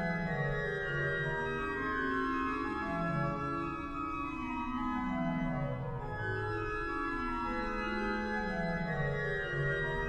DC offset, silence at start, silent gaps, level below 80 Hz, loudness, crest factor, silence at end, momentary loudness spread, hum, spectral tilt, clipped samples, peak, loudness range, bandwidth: under 0.1%; 0 s; none; -48 dBFS; -35 LUFS; 14 dB; 0 s; 4 LU; none; -7.5 dB/octave; under 0.1%; -22 dBFS; 2 LU; 9.6 kHz